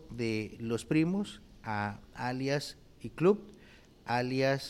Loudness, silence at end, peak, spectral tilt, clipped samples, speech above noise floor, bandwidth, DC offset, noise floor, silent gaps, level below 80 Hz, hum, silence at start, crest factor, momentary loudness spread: -33 LUFS; 0 s; -16 dBFS; -6 dB/octave; under 0.1%; 25 dB; 15.5 kHz; under 0.1%; -57 dBFS; none; -60 dBFS; none; 0 s; 18 dB; 16 LU